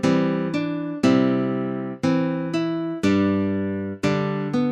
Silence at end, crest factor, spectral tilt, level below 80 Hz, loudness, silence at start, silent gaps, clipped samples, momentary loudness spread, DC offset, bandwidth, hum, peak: 0 s; 16 dB; -7 dB/octave; -62 dBFS; -23 LUFS; 0 s; none; under 0.1%; 6 LU; under 0.1%; 10.5 kHz; none; -6 dBFS